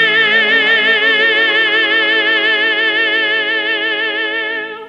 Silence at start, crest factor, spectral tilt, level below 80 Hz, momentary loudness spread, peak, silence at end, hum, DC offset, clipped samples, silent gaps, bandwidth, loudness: 0 s; 12 dB; -3 dB/octave; -68 dBFS; 6 LU; -2 dBFS; 0 s; none; under 0.1%; under 0.1%; none; 8.4 kHz; -11 LUFS